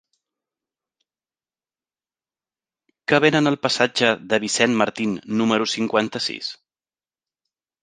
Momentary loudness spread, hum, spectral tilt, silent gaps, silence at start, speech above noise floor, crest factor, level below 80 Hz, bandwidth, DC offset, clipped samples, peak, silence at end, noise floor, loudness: 9 LU; none; -4 dB/octave; none; 3.1 s; over 70 dB; 24 dB; -66 dBFS; 9.8 kHz; under 0.1%; under 0.1%; 0 dBFS; 1.3 s; under -90 dBFS; -20 LUFS